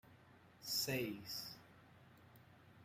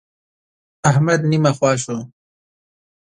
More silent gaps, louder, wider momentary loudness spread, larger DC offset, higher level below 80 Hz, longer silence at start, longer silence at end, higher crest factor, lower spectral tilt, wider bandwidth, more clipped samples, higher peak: neither; second, -43 LUFS vs -17 LUFS; first, 26 LU vs 9 LU; neither; second, -80 dBFS vs -58 dBFS; second, 0.05 s vs 0.85 s; second, 0 s vs 1.1 s; about the same, 22 dB vs 18 dB; second, -3 dB/octave vs -6 dB/octave; first, 16 kHz vs 11 kHz; neither; second, -28 dBFS vs -2 dBFS